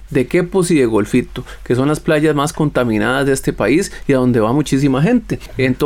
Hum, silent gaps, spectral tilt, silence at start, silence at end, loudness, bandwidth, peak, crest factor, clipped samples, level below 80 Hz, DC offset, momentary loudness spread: none; none; -6 dB/octave; 0 s; 0 s; -15 LUFS; 16.5 kHz; -4 dBFS; 10 dB; under 0.1%; -36 dBFS; under 0.1%; 5 LU